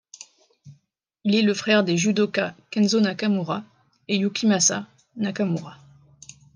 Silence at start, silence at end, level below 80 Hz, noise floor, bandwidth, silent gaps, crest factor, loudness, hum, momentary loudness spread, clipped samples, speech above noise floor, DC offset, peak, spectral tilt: 0.65 s; 0.8 s; -72 dBFS; -67 dBFS; 10 kHz; none; 20 dB; -22 LUFS; none; 12 LU; under 0.1%; 45 dB; under 0.1%; -4 dBFS; -4 dB/octave